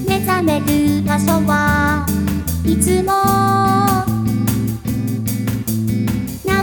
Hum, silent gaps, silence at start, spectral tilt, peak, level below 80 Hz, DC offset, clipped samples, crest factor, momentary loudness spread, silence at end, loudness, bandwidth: none; none; 0 s; -5.5 dB/octave; -2 dBFS; -32 dBFS; under 0.1%; under 0.1%; 14 dB; 6 LU; 0 s; -16 LUFS; over 20 kHz